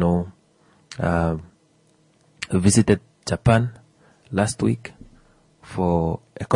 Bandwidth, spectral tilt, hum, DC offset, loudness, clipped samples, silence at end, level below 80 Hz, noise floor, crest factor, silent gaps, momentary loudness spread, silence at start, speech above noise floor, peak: 11 kHz; -6 dB/octave; none; under 0.1%; -22 LUFS; under 0.1%; 0 s; -46 dBFS; -60 dBFS; 20 dB; none; 16 LU; 0 s; 39 dB; -4 dBFS